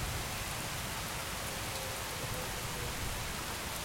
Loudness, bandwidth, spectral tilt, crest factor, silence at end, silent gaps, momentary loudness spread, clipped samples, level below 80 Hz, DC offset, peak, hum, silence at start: -37 LUFS; 16.5 kHz; -2.5 dB/octave; 16 dB; 0 s; none; 1 LU; under 0.1%; -48 dBFS; under 0.1%; -24 dBFS; none; 0 s